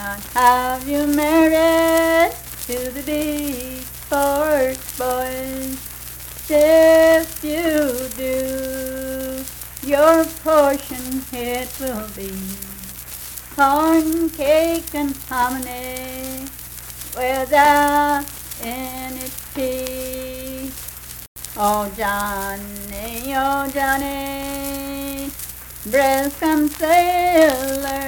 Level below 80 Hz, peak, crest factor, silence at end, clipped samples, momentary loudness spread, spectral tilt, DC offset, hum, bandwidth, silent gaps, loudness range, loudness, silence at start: -42 dBFS; -2 dBFS; 18 dB; 0 s; under 0.1%; 15 LU; -3.5 dB/octave; under 0.1%; none; 19.5 kHz; 21.28-21.36 s; 7 LU; -19 LUFS; 0 s